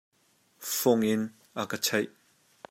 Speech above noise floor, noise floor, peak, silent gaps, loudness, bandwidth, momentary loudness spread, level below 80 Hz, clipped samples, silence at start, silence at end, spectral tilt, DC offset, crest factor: 40 dB; -67 dBFS; -10 dBFS; none; -29 LUFS; 16 kHz; 13 LU; -74 dBFS; under 0.1%; 0.6 s; 0.6 s; -3.5 dB/octave; under 0.1%; 20 dB